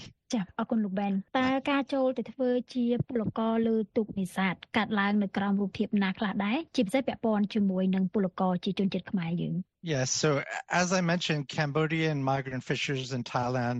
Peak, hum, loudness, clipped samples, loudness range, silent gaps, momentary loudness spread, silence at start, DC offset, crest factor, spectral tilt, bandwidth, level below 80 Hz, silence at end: -12 dBFS; none; -29 LUFS; under 0.1%; 1 LU; none; 5 LU; 0 s; under 0.1%; 16 dB; -5.5 dB/octave; 10.5 kHz; -64 dBFS; 0 s